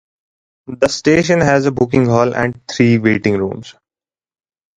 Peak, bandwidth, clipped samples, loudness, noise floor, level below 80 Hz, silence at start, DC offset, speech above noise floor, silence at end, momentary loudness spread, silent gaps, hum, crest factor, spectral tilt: 0 dBFS; 10.5 kHz; under 0.1%; -14 LUFS; under -90 dBFS; -46 dBFS; 0.7 s; under 0.1%; over 76 dB; 1.05 s; 8 LU; none; none; 16 dB; -6 dB/octave